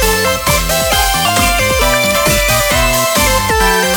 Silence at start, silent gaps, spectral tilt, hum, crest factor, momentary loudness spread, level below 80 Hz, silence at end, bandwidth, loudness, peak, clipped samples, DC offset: 0 s; none; -2.5 dB/octave; none; 12 dB; 1 LU; -22 dBFS; 0 s; over 20 kHz; -11 LUFS; 0 dBFS; under 0.1%; under 0.1%